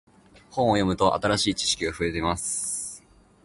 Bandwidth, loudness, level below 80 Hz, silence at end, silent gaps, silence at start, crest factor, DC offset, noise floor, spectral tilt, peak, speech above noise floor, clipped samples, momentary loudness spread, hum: 12 kHz; -25 LUFS; -46 dBFS; 0.45 s; none; 0.5 s; 20 dB; under 0.1%; -52 dBFS; -3.5 dB/octave; -6 dBFS; 28 dB; under 0.1%; 10 LU; none